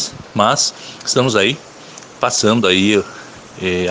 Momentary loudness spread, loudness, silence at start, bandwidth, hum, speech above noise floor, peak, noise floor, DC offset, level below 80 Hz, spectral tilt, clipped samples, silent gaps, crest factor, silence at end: 22 LU; -15 LUFS; 0 s; 10.5 kHz; none; 22 dB; 0 dBFS; -37 dBFS; under 0.1%; -56 dBFS; -3.5 dB/octave; under 0.1%; none; 16 dB; 0 s